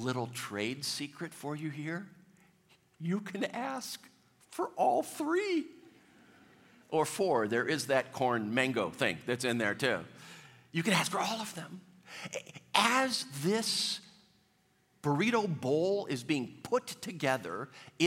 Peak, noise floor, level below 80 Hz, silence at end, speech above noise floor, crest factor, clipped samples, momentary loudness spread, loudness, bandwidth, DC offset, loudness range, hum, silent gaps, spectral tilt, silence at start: -8 dBFS; -71 dBFS; -80 dBFS; 0 s; 38 dB; 26 dB; under 0.1%; 13 LU; -33 LUFS; 16.5 kHz; under 0.1%; 7 LU; none; none; -4 dB/octave; 0 s